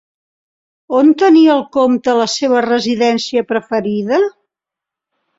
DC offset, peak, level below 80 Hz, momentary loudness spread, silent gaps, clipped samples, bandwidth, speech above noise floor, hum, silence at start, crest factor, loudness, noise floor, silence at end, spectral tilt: under 0.1%; -2 dBFS; -60 dBFS; 9 LU; none; under 0.1%; 7.8 kHz; 72 dB; none; 0.9 s; 12 dB; -13 LUFS; -85 dBFS; 1.1 s; -4.5 dB/octave